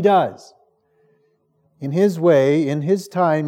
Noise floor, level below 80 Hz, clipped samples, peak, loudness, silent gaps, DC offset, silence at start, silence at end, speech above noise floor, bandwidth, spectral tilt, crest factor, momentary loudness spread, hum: -63 dBFS; -80 dBFS; under 0.1%; -4 dBFS; -18 LUFS; none; under 0.1%; 0 s; 0 s; 46 dB; 16 kHz; -7.5 dB/octave; 16 dB; 10 LU; none